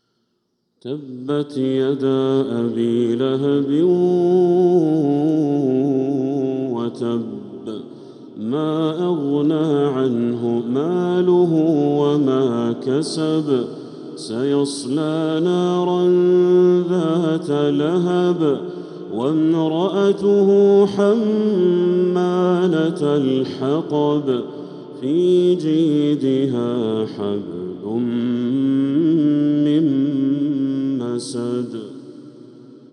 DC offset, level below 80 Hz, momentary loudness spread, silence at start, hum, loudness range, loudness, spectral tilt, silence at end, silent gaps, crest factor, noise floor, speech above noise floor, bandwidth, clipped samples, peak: under 0.1%; -76 dBFS; 12 LU; 0.85 s; none; 5 LU; -18 LUFS; -7.5 dB/octave; 0.15 s; none; 14 dB; -70 dBFS; 53 dB; 10.5 kHz; under 0.1%; -4 dBFS